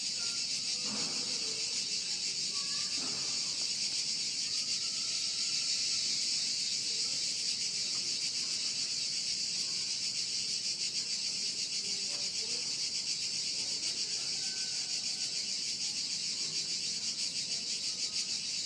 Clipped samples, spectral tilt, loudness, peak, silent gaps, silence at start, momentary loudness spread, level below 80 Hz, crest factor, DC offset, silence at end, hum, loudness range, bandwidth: under 0.1%; 1 dB/octave; -32 LUFS; -20 dBFS; none; 0 s; 2 LU; -78 dBFS; 14 dB; under 0.1%; 0 s; none; 2 LU; 10.5 kHz